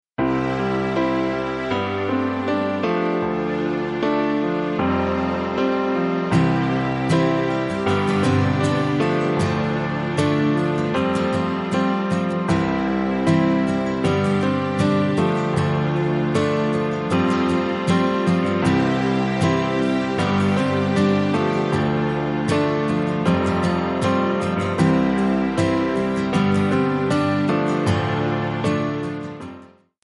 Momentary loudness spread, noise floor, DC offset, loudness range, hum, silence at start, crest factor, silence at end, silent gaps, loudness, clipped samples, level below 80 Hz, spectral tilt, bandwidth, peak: 4 LU; -45 dBFS; under 0.1%; 2 LU; none; 0.2 s; 14 dB; 0.35 s; none; -21 LUFS; under 0.1%; -48 dBFS; -7 dB/octave; 11.5 kHz; -6 dBFS